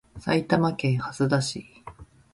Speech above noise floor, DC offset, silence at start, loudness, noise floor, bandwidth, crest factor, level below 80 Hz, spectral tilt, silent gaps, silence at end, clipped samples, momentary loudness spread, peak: 22 dB; under 0.1%; 0.15 s; -25 LUFS; -46 dBFS; 11.5 kHz; 18 dB; -54 dBFS; -6 dB/octave; none; 0.3 s; under 0.1%; 22 LU; -8 dBFS